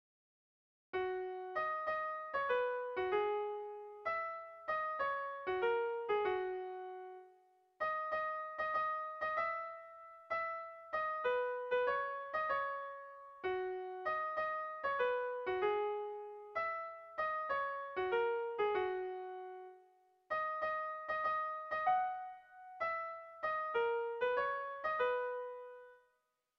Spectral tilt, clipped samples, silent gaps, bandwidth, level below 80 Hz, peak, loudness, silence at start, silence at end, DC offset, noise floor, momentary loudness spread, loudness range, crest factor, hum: -1 dB/octave; under 0.1%; none; 6.2 kHz; -76 dBFS; -22 dBFS; -39 LUFS; 0.95 s; 0.6 s; under 0.1%; -82 dBFS; 12 LU; 1 LU; 16 dB; none